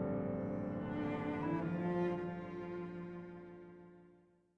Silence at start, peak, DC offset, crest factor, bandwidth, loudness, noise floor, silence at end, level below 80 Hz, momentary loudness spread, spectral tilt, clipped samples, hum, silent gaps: 0 s; -28 dBFS; under 0.1%; 14 dB; 6.2 kHz; -40 LUFS; -68 dBFS; 0.4 s; -66 dBFS; 17 LU; -9.5 dB/octave; under 0.1%; none; none